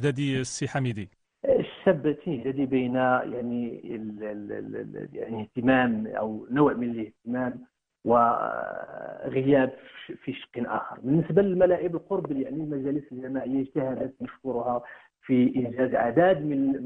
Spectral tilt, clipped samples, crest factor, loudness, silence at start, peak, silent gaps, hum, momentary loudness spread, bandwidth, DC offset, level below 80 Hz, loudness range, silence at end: -7 dB/octave; under 0.1%; 20 dB; -27 LUFS; 0 s; -6 dBFS; none; none; 14 LU; 10 kHz; under 0.1%; -60 dBFS; 3 LU; 0 s